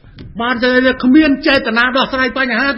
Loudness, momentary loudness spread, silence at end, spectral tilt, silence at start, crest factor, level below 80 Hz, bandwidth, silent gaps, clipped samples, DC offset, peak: -12 LUFS; 7 LU; 0 s; -6.5 dB/octave; 0.15 s; 14 dB; -40 dBFS; 5.8 kHz; none; under 0.1%; under 0.1%; 0 dBFS